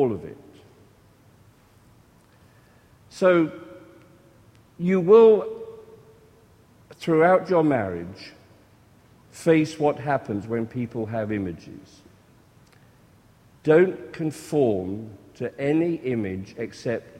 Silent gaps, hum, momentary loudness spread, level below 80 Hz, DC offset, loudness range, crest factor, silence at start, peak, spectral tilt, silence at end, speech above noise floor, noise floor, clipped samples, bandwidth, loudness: none; none; 21 LU; -62 dBFS; under 0.1%; 8 LU; 22 dB; 0 s; -4 dBFS; -7.5 dB/octave; 0 s; 34 dB; -55 dBFS; under 0.1%; 12 kHz; -23 LUFS